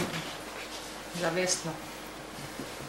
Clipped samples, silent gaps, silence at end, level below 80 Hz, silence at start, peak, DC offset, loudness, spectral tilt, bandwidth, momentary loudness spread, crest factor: under 0.1%; none; 0 s; -58 dBFS; 0 s; -14 dBFS; under 0.1%; -34 LUFS; -3 dB/octave; 16 kHz; 12 LU; 20 dB